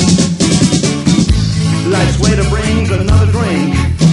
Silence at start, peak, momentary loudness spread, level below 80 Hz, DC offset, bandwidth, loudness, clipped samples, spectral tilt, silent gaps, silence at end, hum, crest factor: 0 s; 0 dBFS; 3 LU; -20 dBFS; under 0.1%; 11.5 kHz; -12 LUFS; under 0.1%; -5.5 dB/octave; none; 0 s; none; 10 dB